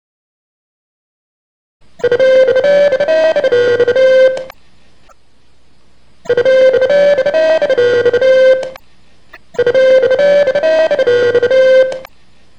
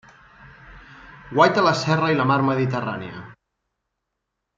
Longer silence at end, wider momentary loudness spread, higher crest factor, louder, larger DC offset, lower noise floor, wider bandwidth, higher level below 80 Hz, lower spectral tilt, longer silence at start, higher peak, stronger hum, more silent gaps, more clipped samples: second, 0.55 s vs 1.25 s; second, 7 LU vs 16 LU; second, 12 dB vs 22 dB; first, -10 LUFS vs -20 LUFS; first, 1% vs under 0.1%; second, -53 dBFS vs -80 dBFS; about the same, 8.2 kHz vs 7.8 kHz; about the same, -52 dBFS vs -56 dBFS; second, -4 dB/octave vs -6 dB/octave; first, 2 s vs 0.45 s; about the same, 0 dBFS vs -2 dBFS; neither; neither; neither